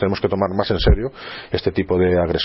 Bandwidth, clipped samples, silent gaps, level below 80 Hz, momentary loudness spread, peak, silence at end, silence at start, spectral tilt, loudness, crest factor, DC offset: 5.8 kHz; under 0.1%; none; -26 dBFS; 9 LU; -2 dBFS; 0 s; 0 s; -10 dB/octave; -19 LUFS; 16 dB; under 0.1%